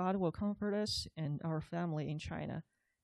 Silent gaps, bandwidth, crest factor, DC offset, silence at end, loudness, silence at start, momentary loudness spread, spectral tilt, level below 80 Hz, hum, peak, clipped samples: none; 12.5 kHz; 14 dB; under 0.1%; 0.4 s; -39 LUFS; 0 s; 7 LU; -6 dB/octave; -60 dBFS; none; -24 dBFS; under 0.1%